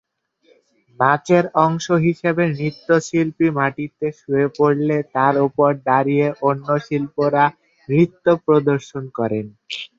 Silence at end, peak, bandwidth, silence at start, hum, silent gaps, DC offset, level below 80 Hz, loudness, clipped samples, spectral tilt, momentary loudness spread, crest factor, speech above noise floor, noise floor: 0.1 s; -2 dBFS; 7.8 kHz; 1 s; none; none; under 0.1%; -60 dBFS; -18 LUFS; under 0.1%; -7 dB/octave; 8 LU; 16 dB; 41 dB; -59 dBFS